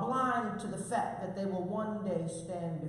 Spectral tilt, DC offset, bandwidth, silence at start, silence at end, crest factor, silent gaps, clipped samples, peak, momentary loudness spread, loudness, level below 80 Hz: -6 dB/octave; under 0.1%; 12 kHz; 0 s; 0 s; 14 dB; none; under 0.1%; -20 dBFS; 7 LU; -35 LUFS; -66 dBFS